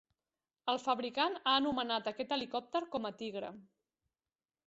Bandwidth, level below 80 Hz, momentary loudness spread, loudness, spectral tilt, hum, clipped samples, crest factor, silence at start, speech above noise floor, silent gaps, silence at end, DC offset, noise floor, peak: 8 kHz; -76 dBFS; 11 LU; -36 LUFS; -0.5 dB/octave; none; under 0.1%; 22 dB; 0.65 s; over 54 dB; none; 1.05 s; under 0.1%; under -90 dBFS; -16 dBFS